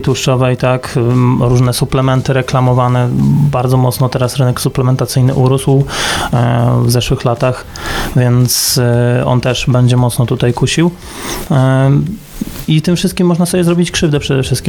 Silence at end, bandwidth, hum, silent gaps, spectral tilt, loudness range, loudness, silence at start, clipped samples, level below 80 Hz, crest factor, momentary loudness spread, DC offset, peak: 0 s; 19 kHz; none; none; -5.5 dB/octave; 1 LU; -12 LUFS; 0 s; under 0.1%; -32 dBFS; 10 dB; 4 LU; under 0.1%; 0 dBFS